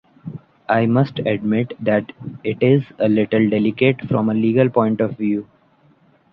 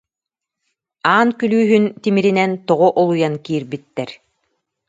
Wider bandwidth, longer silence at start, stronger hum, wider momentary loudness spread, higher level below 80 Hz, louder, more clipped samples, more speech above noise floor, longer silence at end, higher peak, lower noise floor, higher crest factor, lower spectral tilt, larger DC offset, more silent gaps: second, 5.2 kHz vs 7.8 kHz; second, 0.25 s vs 1.05 s; neither; about the same, 11 LU vs 13 LU; first, -58 dBFS vs -66 dBFS; about the same, -18 LUFS vs -16 LUFS; neither; second, 38 dB vs 69 dB; first, 0.9 s vs 0.75 s; about the same, -2 dBFS vs 0 dBFS; second, -55 dBFS vs -85 dBFS; about the same, 16 dB vs 18 dB; first, -10.5 dB/octave vs -7 dB/octave; neither; neither